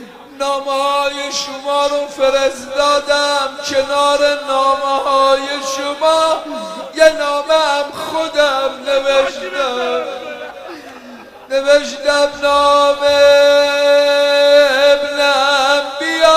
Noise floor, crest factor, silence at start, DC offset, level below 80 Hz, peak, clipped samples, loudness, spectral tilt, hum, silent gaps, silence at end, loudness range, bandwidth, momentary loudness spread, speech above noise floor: -36 dBFS; 14 dB; 0 s; under 0.1%; -50 dBFS; 0 dBFS; under 0.1%; -14 LUFS; -1 dB/octave; none; none; 0 s; 7 LU; 15.5 kHz; 10 LU; 22 dB